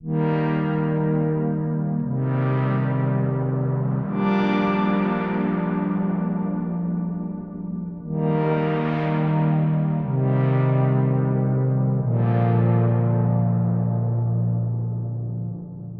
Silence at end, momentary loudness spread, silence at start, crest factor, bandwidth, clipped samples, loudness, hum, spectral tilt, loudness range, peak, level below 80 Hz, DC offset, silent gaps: 0 s; 8 LU; 0 s; 12 dB; 5 kHz; under 0.1%; -22 LUFS; none; -11 dB/octave; 4 LU; -10 dBFS; -52 dBFS; under 0.1%; none